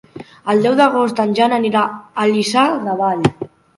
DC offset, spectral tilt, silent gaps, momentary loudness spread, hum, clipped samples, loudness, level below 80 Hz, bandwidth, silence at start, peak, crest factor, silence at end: under 0.1%; -5.5 dB/octave; none; 6 LU; none; under 0.1%; -16 LUFS; -52 dBFS; 11.5 kHz; 0.15 s; 0 dBFS; 16 dB; 0.3 s